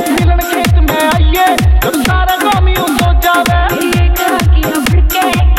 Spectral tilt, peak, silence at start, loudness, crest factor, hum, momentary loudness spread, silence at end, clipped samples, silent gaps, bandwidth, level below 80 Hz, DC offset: -5 dB/octave; 0 dBFS; 0 s; -11 LUFS; 10 dB; none; 2 LU; 0 s; under 0.1%; none; 16.5 kHz; -12 dBFS; under 0.1%